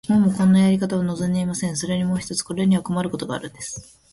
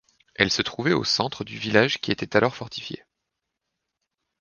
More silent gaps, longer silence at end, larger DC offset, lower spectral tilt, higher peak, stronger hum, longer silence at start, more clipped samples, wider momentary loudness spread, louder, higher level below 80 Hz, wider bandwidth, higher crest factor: neither; second, 0.3 s vs 1.45 s; neither; first, -6 dB/octave vs -4 dB/octave; second, -8 dBFS vs 0 dBFS; neither; second, 0.05 s vs 0.4 s; neither; about the same, 14 LU vs 14 LU; about the same, -21 LUFS vs -23 LUFS; about the same, -52 dBFS vs -56 dBFS; first, 11.5 kHz vs 10 kHz; second, 12 dB vs 26 dB